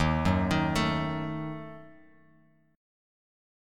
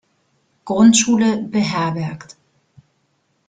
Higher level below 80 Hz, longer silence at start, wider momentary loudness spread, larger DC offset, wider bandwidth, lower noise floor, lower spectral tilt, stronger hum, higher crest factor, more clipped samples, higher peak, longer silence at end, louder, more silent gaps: first, -44 dBFS vs -58 dBFS; second, 0 s vs 0.65 s; about the same, 17 LU vs 15 LU; neither; first, 15 kHz vs 9.6 kHz; about the same, -63 dBFS vs -66 dBFS; first, -6 dB/octave vs -4 dB/octave; neither; about the same, 20 dB vs 18 dB; neither; second, -12 dBFS vs -2 dBFS; second, 0.95 s vs 1.3 s; second, -29 LUFS vs -16 LUFS; neither